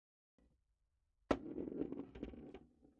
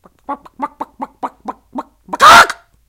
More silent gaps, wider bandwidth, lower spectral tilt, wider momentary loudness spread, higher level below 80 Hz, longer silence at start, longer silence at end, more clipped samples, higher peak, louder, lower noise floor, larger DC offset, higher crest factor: neither; second, 7 kHz vs over 20 kHz; first, -5.5 dB/octave vs -1 dB/octave; second, 16 LU vs 25 LU; second, -64 dBFS vs -44 dBFS; first, 1.3 s vs 0.3 s; second, 0.15 s vs 0.35 s; second, under 0.1% vs 1%; second, -20 dBFS vs 0 dBFS; second, -45 LUFS vs -6 LUFS; first, -83 dBFS vs -30 dBFS; neither; first, 28 dB vs 14 dB